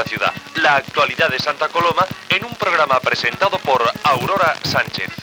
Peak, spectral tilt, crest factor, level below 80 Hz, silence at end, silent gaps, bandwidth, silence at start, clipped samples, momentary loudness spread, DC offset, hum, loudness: -2 dBFS; -3.5 dB/octave; 16 dB; -56 dBFS; 0 s; none; over 20 kHz; 0 s; under 0.1%; 4 LU; under 0.1%; none; -17 LUFS